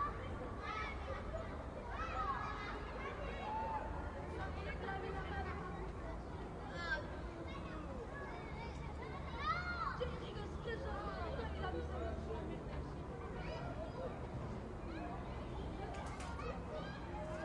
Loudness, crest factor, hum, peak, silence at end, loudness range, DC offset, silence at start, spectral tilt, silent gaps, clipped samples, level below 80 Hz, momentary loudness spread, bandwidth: -45 LUFS; 16 dB; none; -28 dBFS; 0 s; 3 LU; under 0.1%; 0 s; -6.5 dB/octave; none; under 0.1%; -50 dBFS; 6 LU; 11 kHz